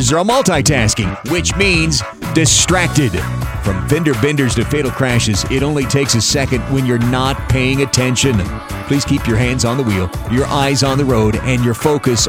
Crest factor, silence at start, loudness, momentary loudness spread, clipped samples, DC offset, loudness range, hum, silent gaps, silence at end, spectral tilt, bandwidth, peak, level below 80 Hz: 14 dB; 0 s; -14 LUFS; 6 LU; under 0.1%; under 0.1%; 2 LU; none; none; 0 s; -4.5 dB/octave; 16.5 kHz; 0 dBFS; -28 dBFS